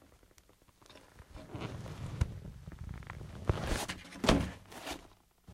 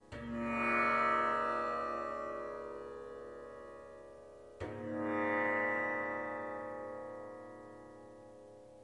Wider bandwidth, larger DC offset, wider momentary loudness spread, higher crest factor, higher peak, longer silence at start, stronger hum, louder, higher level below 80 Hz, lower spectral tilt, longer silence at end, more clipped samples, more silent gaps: first, 16 kHz vs 11.5 kHz; neither; about the same, 23 LU vs 23 LU; first, 30 dB vs 18 dB; first, -8 dBFS vs -20 dBFS; about the same, 0.1 s vs 0 s; neither; about the same, -38 LUFS vs -36 LUFS; first, -46 dBFS vs -66 dBFS; about the same, -5 dB/octave vs -6 dB/octave; about the same, 0 s vs 0 s; neither; neither